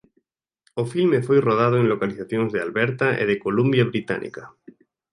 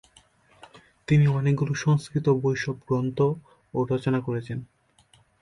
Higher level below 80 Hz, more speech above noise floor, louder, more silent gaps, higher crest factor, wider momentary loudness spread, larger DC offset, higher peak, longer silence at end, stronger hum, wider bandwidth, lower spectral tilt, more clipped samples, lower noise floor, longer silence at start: about the same, -62 dBFS vs -58 dBFS; first, 49 dB vs 37 dB; first, -21 LUFS vs -25 LUFS; neither; about the same, 16 dB vs 16 dB; second, 10 LU vs 13 LU; neither; first, -6 dBFS vs -10 dBFS; about the same, 0.65 s vs 0.75 s; neither; about the same, 11 kHz vs 11 kHz; about the same, -7.5 dB/octave vs -7.5 dB/octave; neither; first, -70 dBFS vs -61 dBFS; second, 0.75 s vs 1.1 s